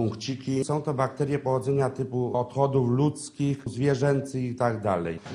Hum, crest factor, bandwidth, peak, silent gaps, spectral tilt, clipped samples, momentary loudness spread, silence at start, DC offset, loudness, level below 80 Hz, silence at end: none; 18 dB; 11 kHz; -8 dBFS; none; -7 dB/octave; under 0.1%; 6 LU; 0 s; under 0.1%; -27 LUFS; -56 dBFS; 0 s